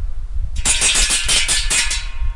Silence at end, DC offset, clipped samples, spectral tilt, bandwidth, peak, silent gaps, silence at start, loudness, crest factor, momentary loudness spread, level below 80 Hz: 0 s; under 0.1%; under 0.1%; 0 dB/octave; 11.5 kHz; -2 dBFS; none; 0 s; -15 LUFS; 14 dB; 15 LU; -22 dBFS